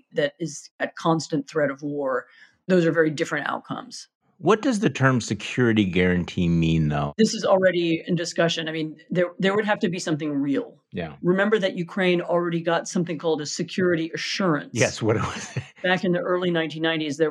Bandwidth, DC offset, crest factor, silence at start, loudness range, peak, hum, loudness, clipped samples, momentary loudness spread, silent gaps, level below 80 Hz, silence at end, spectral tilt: 11 kHz; under 0.1%; 20 dB; 0.15 s; 3 LU; -4 dBFS; none; -23 LUFS; under 0.1%; 9 LU; 0.71-0.79 s, 4.15-4.21 s; -52 dBFS; 0 s; -5.5 dB/octave